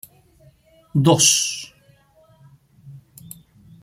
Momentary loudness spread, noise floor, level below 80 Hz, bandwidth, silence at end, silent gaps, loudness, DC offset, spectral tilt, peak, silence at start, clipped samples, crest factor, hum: 27 LU; -55 dBFS; -60 dBFS; 16 kHz; 0.85 s; none; -16 LUFS; under 0.1%; -3 dB/octave; -2 dBFS; 0.95 s; under 0.1%; 22 dB; none